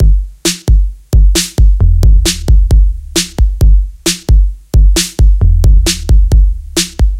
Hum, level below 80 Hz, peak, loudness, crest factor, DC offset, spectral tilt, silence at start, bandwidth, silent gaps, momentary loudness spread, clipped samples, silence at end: none; -8 dBFS; 0 dBFS; -11 LUFS; 8 dB; under 0.1%; -4 dB/octave; 0 s; 15 kHz; none; 5 LU; 0.2%; 0 s